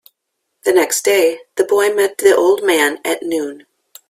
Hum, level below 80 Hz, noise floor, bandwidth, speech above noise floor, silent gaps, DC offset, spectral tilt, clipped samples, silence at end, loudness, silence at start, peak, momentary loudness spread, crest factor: none; -62 dBFS; -73 dBFS; 16 kHz; 59 dB; none; under 0.1%; -1.5 dB/octave; under 0.1%; 0.55 s; -15 LUFS; 0.65 s; 0 dBFS; 9 LU; 16 dB